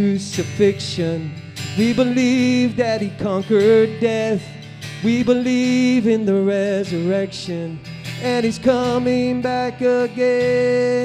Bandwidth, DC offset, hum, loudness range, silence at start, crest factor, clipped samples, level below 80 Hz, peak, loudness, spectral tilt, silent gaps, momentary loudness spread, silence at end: 12.5 kHz; under 0.1%; none; 2 LU; 0 s; 16 dB; under 0.1%; -54 dBFS; -2 dBFS; -18 LUFS; -6 dB/octave; none; 10 LU; 0 s